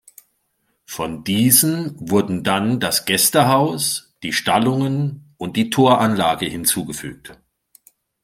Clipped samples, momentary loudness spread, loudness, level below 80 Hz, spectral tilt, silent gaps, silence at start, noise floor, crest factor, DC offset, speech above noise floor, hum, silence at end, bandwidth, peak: under 0.1%; 13 LU; -17 LUFS; -56 dBFS; -4 dB/octave; none; 0.9 s; -69 dBFS; 20 dB; under 0.1%; 50 dB; none; 0.9 s; 16.5 kHz; 0 dBFS